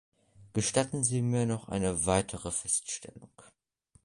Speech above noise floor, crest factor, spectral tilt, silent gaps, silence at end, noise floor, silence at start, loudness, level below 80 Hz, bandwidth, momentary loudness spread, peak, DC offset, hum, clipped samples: 36 dB; 22 dB; -4.5 dB/octave; none; 0.65 s; -67 dBFS; 0.4 s; -30 LUFS; -54 dBFS; 11.5 kHz; 9 LU; -10 dBFS; under 0.1%; none; under 0.1%